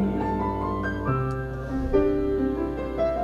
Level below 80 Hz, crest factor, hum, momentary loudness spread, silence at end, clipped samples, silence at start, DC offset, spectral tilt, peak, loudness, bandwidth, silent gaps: -36 dBFS; 18 dB; none; 6 LU; 0 s; under 0.1%; 0 s; under 0.1%; -9 dB/octave; -8 dBFS; -26 LUFS; 10.5 kHz; none